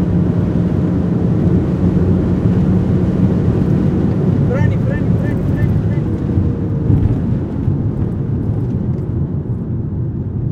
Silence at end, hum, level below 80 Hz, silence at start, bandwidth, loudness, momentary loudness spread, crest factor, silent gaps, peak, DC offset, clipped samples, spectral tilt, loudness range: 0 s; none; -28 dBFS; 0 s; 6.2 kHz; -16 LUFS; 6 LU; 14 dB; none; 0 dBFS; under 0.1%; under 0.1%; -10.5 dB/octave; 3 LU